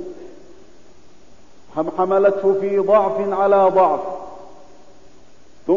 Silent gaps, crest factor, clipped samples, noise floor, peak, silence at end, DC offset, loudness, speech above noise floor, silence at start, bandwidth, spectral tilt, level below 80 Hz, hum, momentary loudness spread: none; 16 dB; under 0.1%; -50 dBFS; -4 dBFS; 0 s; 1%; -17 LUFS; 33 dB; 0 s; 7.4 kHz; -7.5 dB/octave; -56 dBFS; none; 19 LU